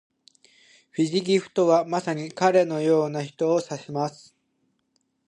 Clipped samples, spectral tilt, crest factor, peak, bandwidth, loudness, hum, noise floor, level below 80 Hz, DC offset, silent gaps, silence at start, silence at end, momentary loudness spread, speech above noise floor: under 0.1%; -5.5 dB/octave; 20 dB; -6 dBFS; 11 kHz; -24 LUFS; none; -72 dBFS; -76 dBFS; under 0.1%; none; 0.95 s; 1.15 s; 10 LU; 49 dB